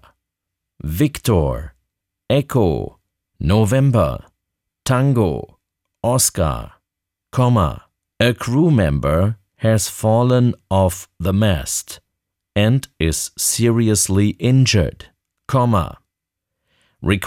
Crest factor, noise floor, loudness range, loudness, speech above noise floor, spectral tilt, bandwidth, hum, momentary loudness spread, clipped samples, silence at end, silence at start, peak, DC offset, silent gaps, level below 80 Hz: 14 dB; -82 dBFS; 3 LU; -18 LUFS; 65 dB; -5.5 dB/octave; 17.5 kHz; none; 11 LU; under 0.1%; 0 s; 0.85 s; -4 dBFS; under 0.1%; none; -36 dBFS